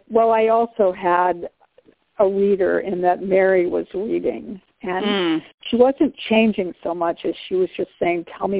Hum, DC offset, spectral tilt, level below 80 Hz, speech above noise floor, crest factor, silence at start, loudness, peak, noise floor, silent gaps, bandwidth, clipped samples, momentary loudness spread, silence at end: none; under 0.1%; -9.5 dB/octave; -58 dBFS; 37 dB; 18 dB; 0.1 s; -20 LUFS; -2 dBFS; -56 dBFS; 5.54-5.58 s; 4 kHz; under 0.1%; 10 LU; 0 s